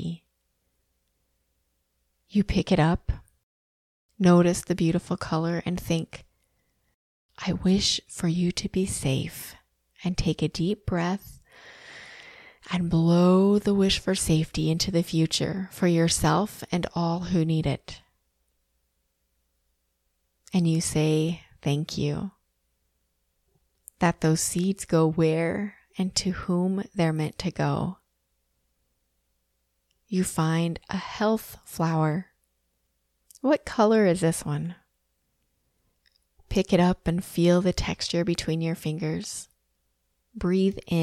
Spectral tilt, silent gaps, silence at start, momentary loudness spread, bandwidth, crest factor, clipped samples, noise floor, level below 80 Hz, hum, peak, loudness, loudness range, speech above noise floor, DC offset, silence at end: -5.5 dB/octave; 3.43-4.09 s, 6.94-7.29 s; 0 s; 12 LU; 14.5 kHz; 20 dB; under 0.1%; -75 dBFS; -46 dBFS; none; -6 dBFS; -25 LUFS; 7 LU; 50 dB; under 0.1%; 0 s